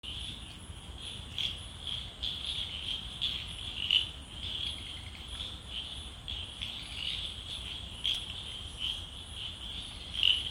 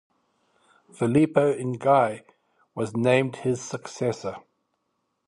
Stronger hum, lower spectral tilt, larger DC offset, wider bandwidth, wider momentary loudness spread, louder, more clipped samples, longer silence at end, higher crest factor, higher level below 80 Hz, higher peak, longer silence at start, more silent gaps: neither; second, -2 dB/octave vs -6.5 dB/octave; neither; first, 16.5 kHz vs 11.5 kHz; about the same, 13 LU vs 15 LU; second, -35 LUFS vs -24 LUFS; neither; second, 0 s vs 0.9 s; about the same, 26 dB vs 22 dB; first, -50 dBFS vs -64 dBFS; second, -12 dBFS vs -4 dBFS; second, 0.05 s vs 1 s; neither